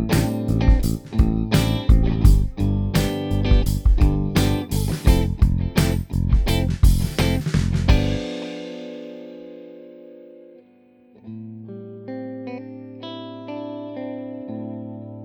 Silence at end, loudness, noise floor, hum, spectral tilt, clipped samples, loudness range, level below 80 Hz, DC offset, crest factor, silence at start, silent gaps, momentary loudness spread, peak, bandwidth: 0 s; -21 LUFS; -53 dBFS; none; -6.5 dB/octave; under 0.1%; 17 LU; -24 dBFS; under 0.1%; 20 dB; 0 s; none; 18 LU; 0 dBFS; 19 kHz